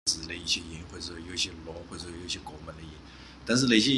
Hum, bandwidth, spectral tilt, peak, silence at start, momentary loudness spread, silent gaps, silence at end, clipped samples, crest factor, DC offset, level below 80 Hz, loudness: none; 12.5 kHz; -3 dB/octave; -8 dBFS; 0.05 s; 19 LU; none; 0 s; under 0.1%; 22 dB; under 0.1%; -52 dBFS; -30 LUFS